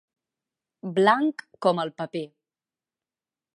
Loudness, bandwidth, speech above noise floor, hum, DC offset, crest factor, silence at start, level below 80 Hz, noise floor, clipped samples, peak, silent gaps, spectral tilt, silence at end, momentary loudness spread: -24 LUFS; 11.5 kHz; over 66 dB; none; under 0.1%; 22 dB; 0.85 s; -82 dBFS; under -90 dBFS; under 0.1%; -6 dBFS; none; -6 dB/octave; 1.3 s; 16 LU